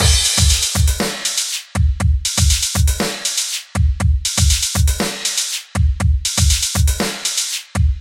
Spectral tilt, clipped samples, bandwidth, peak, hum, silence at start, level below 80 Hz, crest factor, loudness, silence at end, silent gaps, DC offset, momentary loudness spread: -3 dB/octave; under 0.1%; 17 kHz; 0 dBFS; none; 0 s; -20 dBFS; 16 dB; -16 LUFS; 0 s; none; under 0.1%; 6 LU